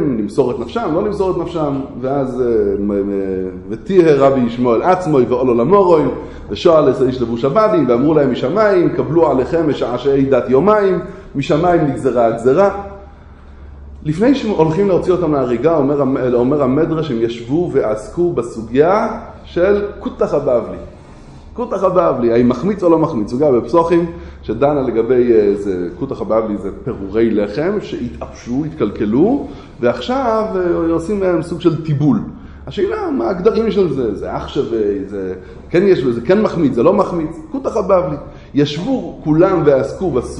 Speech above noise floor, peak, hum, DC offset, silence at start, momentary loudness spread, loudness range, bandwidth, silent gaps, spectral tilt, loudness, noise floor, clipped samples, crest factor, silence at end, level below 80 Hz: 23 dB; 0 dBFS; none; under 0.1%; 0 s; 11 LU; 4 LU; 10 kHz; none; -8 dB/octave; -15 LUFS; -37 dBFS; under 0.1%; 14 dB; 0 s; -38 dBFS